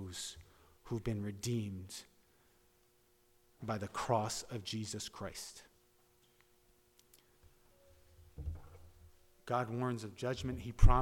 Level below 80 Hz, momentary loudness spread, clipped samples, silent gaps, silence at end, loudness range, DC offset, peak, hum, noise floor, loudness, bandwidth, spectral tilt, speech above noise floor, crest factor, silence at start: -42 dBFS; 19 LU; under 0.1%; none; 0 s; 14 LU; under 0.1%; -12 dBFS; none; -71 dBFS; -40 LUFS; 15.5 kHz; -5.5 dB/octave; 36 dB; 26 dB; 0 s